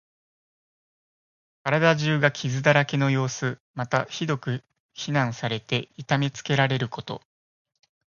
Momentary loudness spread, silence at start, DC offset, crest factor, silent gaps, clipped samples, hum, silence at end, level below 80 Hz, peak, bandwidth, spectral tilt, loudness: 13 LU; 1.65 s; under 0.1%; 24 dB; 3.60-3.74 s, 4.80-4.89 s; under 0.1%; none; 1 s; -64 dBFS; -2 dBFS; 7.2 kHz; -5.5 dB/octave; -25 LUFS